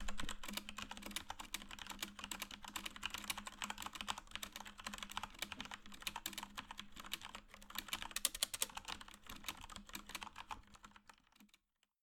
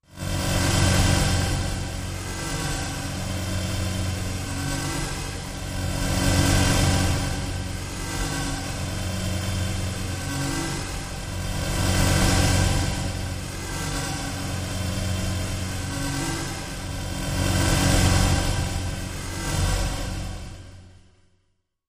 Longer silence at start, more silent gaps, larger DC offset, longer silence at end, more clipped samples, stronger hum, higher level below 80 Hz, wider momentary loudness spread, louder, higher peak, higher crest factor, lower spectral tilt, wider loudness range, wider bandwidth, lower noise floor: about the same, 0 s vs 0.1 s; neither; neither; second, 0.55 s vs 1 s; neither; neither; second, -60 dBFS vs -32 dBFS; about the same, 12 LU vs 11 LU; second, -46 LUFS vs -25 LUFS; second, -16 dBFS vs -6 dBFS; first, 34 dB vs 20 dB; second, -0.5 dB/octave vs -4 dB/octave; about the same, 4 LU vs 4 LU; first, 19 kHz vs 15.5 kHz; first, -77 dBFS vs -70 dBFS